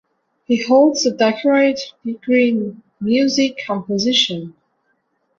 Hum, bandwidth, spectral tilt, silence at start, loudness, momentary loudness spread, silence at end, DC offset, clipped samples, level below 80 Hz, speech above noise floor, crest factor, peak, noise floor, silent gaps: none; 7.6 kHz; -4 dB/octave; 0.5 s; -17 LUFS; 14 LU; 0.9 s; under 0.1%; under 0.1%; -62 dBFS; 50 dB; 16 dB; -2 dBFS; -66 dBFS; none